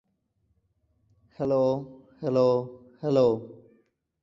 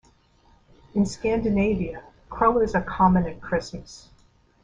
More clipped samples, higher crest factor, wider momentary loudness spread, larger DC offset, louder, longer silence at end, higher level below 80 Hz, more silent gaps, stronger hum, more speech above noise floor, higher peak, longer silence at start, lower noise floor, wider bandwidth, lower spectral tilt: neither; about the same, 18 dB vs 18 dB; about the same, 17 LU vs 19 LU; neither; second, -26 LUFS vs -23 LUFS; about the same, 0.65 s vs 0.65 s; second, -66 dBFS vs -42 dBFS; neither; neither; first, 48 dB vs 36 dB; second, -10 dBFS vs -6 dBFS; first, 1.4 s vs 0.95 s; first, -73 dBFS vs -59 dBFS; second, 7.4 kHz vs 9.4 kHz; first, -8.5 dB/octave vs -7 dB/octave